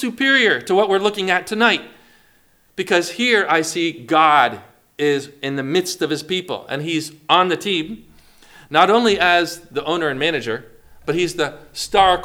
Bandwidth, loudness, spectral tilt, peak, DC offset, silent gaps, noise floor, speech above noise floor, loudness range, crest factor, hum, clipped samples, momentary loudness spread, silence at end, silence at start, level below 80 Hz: 19 kHz; -18 LUFS; -3.5 dB/octave; 0 dBFS; under 0.1%; none; -56 dBFS; 38 dB; 3 LU; 18 dB; none; under 0.1%; 12 LU; 0 s; 0 s; -52 dBFS